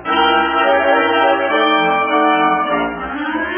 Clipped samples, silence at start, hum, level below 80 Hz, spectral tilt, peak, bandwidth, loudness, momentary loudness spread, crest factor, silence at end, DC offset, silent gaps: under 0.1%; 0 s; none; -46 dBFS; -7.5 dB/octave; -2 dBFS; 3.5 kHz; -14 LUFS; 7 LU; 14 dB; 0 s; under 0.1%; none